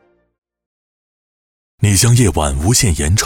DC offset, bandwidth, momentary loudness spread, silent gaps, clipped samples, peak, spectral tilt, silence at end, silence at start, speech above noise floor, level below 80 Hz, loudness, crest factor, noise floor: under 0.1%; 18 kHz; 5 LU; none; under 0.1%; -2 dBFS; -4 dB/octave; 0 s; 1.8 s; over 78 dB; -28 dBFS; -13 LUFS; 14 dB; under -90 dBFS